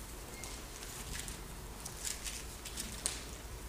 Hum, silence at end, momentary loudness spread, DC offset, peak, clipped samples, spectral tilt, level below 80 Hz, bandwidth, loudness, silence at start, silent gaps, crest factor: none; 0 s; 8 LU; under 0.1%; -10 dBFS; under 0.1%; -2 dB/octave; -50 dBFS; 15.5 kHz; -42 LUFS; 0 s; none; 34 dB